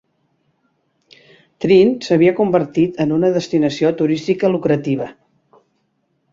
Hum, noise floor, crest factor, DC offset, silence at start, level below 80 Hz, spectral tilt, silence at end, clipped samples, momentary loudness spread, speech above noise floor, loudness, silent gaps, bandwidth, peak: none; -66 dBFS; 16 dB; under 0.1%; 1.6 s; -58 dBFS; -7 dB/octave; 1.2 s; under 0.1%; 7 LU; 51 dB; -16 LUFS; none; 7.6 kHz; -2 dBFS